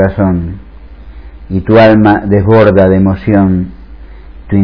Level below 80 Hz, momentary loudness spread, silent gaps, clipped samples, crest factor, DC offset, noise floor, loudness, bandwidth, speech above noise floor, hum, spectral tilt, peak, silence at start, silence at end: -30 dBFS; 13 LU; none; 2%; 10 dB; 0.8%; -31 dBFS; -8 LUFS; 5.4 kHz; 23 dB; none; -10.5 dB/octave; 0 dBFS; 0 s; 0 s